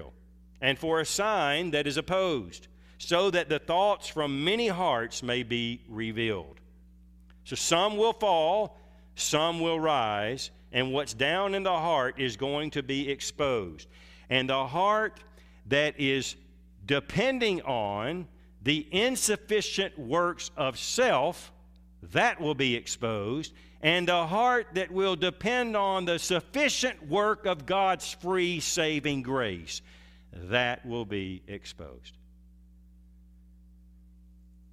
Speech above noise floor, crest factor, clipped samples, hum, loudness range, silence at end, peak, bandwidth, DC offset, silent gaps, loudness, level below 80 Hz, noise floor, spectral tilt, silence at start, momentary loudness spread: 26 dB; 22 dB; under 0.1%; none; 4 LU; 2.6 s; -8 dBFS; 16 kHz; under 0.1%; none; -28 LUFS; -56 dBFS; -55 dBFS; -3.5 dB/octave; 0 s; 10 LU